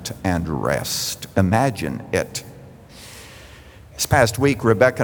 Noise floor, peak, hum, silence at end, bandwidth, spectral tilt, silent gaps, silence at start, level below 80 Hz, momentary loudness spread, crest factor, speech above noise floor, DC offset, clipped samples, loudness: -43 dBFS; -2 dBFS; none; 0 s; over 20 kHz; -5 dB/octave; none; 0 s; -44 dBFS; 23 LU; 20 dB; 24 dB; under 0.1%; under 0.1%; -20 LUFS